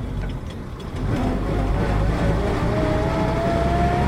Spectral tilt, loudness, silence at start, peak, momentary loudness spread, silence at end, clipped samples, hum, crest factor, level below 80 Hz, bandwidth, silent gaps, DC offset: -7.5 dB/octave; -23 LUFS; 0 s; -8 dBFS; 10 LU; 0 s; under 0.1%; none; 14 dB; -26 dBFS; 12 kHz; none; under 0.1%